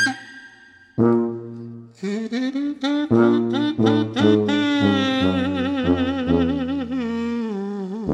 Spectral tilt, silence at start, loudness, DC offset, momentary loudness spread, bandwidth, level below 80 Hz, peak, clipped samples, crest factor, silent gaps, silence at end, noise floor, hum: -6.5 dB/octave; 0 s; -21 LUFS; under 0.1%; 13 LU; 10 kHz; -50 dBFS; -4 dBFS; under 0.1%; 18 dB; none; 0 s; -49 dBFS; none